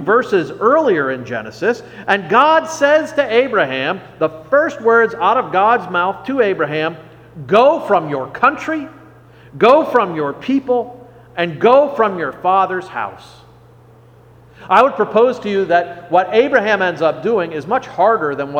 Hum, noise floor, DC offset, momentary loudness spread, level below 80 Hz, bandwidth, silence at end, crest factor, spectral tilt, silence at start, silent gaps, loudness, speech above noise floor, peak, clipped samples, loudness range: none; -44 dBFS; under 0.1%; 10 LU; -56 dBFS; 9.4 kHz; 0 s; 16 dB; -5.5 dB/octave; 0 s; none; -15 LUFS; 30 dB; 0 dBFS; under 0.1%; 3 LU